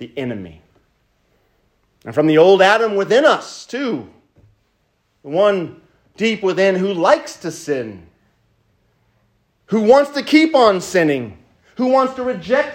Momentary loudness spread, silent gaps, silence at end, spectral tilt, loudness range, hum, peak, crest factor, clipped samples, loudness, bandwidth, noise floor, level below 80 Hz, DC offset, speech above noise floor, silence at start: 16 LU; none; 0 s; -5 dB/octave; 5 LU; none; 0 dBFS; 18 dB; under 0.1%; -16 LUFS; 16 kHz; -65 dBFS; -60 dBFS; under 0.1%; 49 dB; 0 s